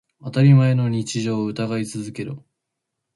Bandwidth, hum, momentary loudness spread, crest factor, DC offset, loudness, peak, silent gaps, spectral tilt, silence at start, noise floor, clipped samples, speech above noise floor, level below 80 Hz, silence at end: 11.5 kHz; none; 17 LU; 16 dB; under 0.1%; -20 LUFS; -4 dBFS; none; -7 dB/octave; 0.25 s; -80 dBFS; under 0.1%; 61 dB; -60 dBFS; 0.75 s